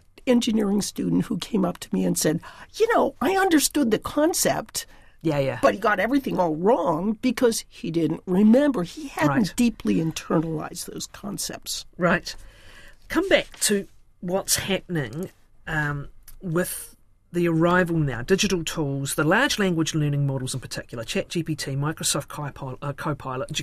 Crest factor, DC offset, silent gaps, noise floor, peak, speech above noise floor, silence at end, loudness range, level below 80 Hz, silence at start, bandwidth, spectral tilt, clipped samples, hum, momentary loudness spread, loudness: 20 dB; under 0.1%; none; -46 dBFS; -4 dBFS; 22 dB; 0 s; 5 LU; -48 dBFS; 0.25 s; 15.5 kHz; -4.5 dB/octave; under 0.1%; none; 13 LU; -24 LUFS